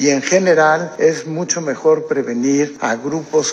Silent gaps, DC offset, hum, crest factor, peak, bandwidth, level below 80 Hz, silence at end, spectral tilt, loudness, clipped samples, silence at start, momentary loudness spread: none; under 0.1%; none; 14 dB; 0 dBFS; 9.2 kHz; -68 dBFS; 0 s; -4 dB/octave; -16 LUFS; under 0.1%; 0 s; 7 LU